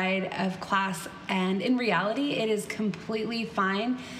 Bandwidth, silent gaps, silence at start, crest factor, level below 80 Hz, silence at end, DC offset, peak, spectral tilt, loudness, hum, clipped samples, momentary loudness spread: 15 kHz; none; 0 s; 16 dB; -66 dBFS; 0 s; under 0.1%; -14 dBFS; -5 dB/octave; -28 LUFS; none; under 0.1%; 5 LU